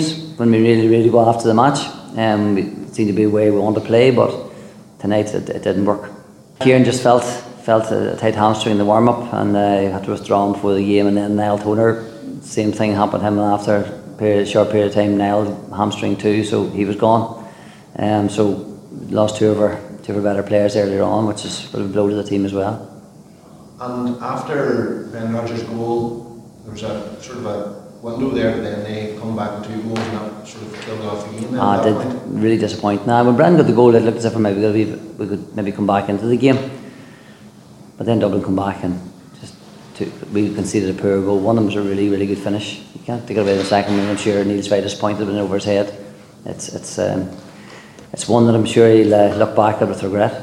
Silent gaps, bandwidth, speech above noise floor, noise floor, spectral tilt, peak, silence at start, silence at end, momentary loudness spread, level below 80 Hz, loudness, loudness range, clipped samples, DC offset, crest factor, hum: none; 12.5 kHz; 26 dB; -42 dBFS; -6.5 dB/octave; 0 dBFS; 0 s; 0 s; 15 LU; -54 dBFS; -17 LUFS; 8 LU; under 0.1%; under 0.1%; 18 dB; none